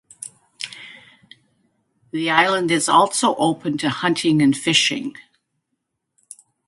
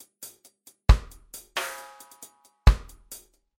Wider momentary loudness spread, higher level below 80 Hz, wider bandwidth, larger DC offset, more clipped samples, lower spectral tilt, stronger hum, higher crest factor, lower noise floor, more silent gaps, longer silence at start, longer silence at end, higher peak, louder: second, 20 LU vs 23 LU; second, -66 dBFS vs -28 dBFS; second, 11.5 kHz vs 16.5 kHz; neither; neither; second, -3.5 dB/octave vs -5 dB/octave; neither; about the same, 22 dB vs 22 dB; first, -76 dBFS vs -57 dBFS; neither; second, 0.2 s vs 0.9 s; first, 1.45 s vs 0.8 s; first, 0 dBFS vs -4 dBFS; first, -18 LUFS vs -26 LUFS